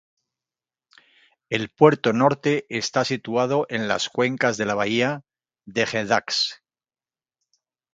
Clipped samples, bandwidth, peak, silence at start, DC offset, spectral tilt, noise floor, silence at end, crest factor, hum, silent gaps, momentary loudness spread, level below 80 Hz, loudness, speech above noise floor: under 0.1%; 9.2 kHz; -2 dBFS; 1.5 s; under 0.1%; -4.5 dB/octave; under -90 dBFS; 1.4 s; 22 dB; none; none; 8 LU; -66 dBFS; -22 LUFS; over 68 dB